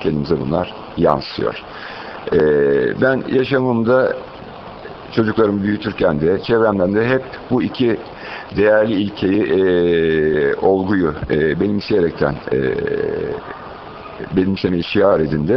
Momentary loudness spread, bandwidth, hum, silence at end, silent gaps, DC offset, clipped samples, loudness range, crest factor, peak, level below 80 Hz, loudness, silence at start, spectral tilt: 15 LU; 6 kHz; none; 0 s; none; under 0.1%; under 0.1%; 3 LU; 16 dB; 0 dBFS; -42 dBFS; -17 LUFS; 0 s; -9 dB/octave